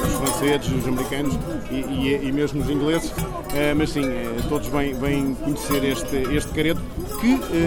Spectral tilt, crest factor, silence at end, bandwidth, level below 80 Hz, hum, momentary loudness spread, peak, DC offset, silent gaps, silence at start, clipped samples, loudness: -5 dB/octave; 16 dB; 0 s; over 20 kHz; -34 dBFS; none; 6 LU; -6 dBFS; under 0.1%; none; 0 s; under 0.1%; -23 LUFS